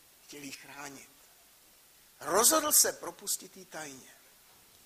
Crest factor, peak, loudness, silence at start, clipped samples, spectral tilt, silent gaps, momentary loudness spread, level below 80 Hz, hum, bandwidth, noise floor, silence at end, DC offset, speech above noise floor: 24 dB; -10 dBFS; -26 LUFS; 0.3 s; under 0.1%; 0 dB/octave; none; 23 LU; -72 dBFS; none; 15.5 kHz; -61 dBFS; 0.85 s; under 0.1%; 29 dB